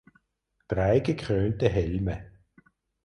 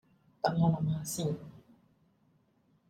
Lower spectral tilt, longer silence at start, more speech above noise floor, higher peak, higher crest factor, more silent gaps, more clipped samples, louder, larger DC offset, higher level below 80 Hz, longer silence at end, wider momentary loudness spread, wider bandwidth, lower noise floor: first, -8 dB/octave vs -6 dB/octave; first, 0.7 s vs 0.45 s; first, 51 dB vs 40 dB; first, -8 dBFS vs -14 dBFS; about the same, 20 dB vs 22 dB; neither; neither; first, -27 LUFS vs -32 LUFS; neither; first, -42 dBFS vs -64 dBFS; second, 0.75 s vs 1.3 s; second, 9 LU vs 12 LU; second, 10.5 kHz vs 15.5 kHz; first, -76 dBFS vs -70 dBFS